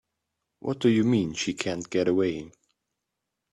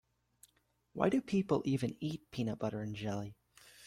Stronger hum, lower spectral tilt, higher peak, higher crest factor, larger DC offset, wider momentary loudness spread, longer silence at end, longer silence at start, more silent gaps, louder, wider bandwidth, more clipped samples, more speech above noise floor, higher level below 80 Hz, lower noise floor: second, none vs 60 Hz at -60 dBFS; second, -5.5 dB/octave vs -7 dB/octave; first, -6 dBFS vs -16 dBFS; about the same, 20 dB vs 22 dB; neither; about the same, 11 LU vs 9 LU; first, 1.05 s vs 0 s; second, 0.65 s vs 0.95 s; neither; first, -26 LUFS vs -36 LUFS; second, 11.5 kHz vs 15.5 kHz; neither; first, 58 dB vs 40 dB; first, -62 dBFS vs -68 dBFS; first, -84 dBFS vs -75 dBFS